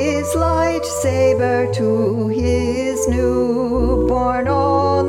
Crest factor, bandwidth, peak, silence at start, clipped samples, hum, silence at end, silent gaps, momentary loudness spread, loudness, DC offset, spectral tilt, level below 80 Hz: 12 dB; 16.5 kHz; -4 dBFS; 0 s; under 0.1%; none; 0 s; none; 3 LU; -17 LUFS; under 0.1%; -6 dB/octave; -30 dBFS